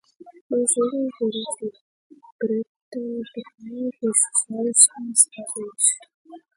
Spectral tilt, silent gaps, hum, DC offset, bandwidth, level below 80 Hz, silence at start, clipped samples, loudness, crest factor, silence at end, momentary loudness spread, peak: -2 dB/octave; 0.41-0.50 s, 1.81-2.10 s, 2.32-2.39 s, 2.69-2.92 s, 6.14-6.25 s; none; under 0.1%; 11.5 kHz; -76 dBFS; 0.2 s; under 0.1%; -21 LUFS; 24 dB; 0.2 s; 18 LU; 0 dBFS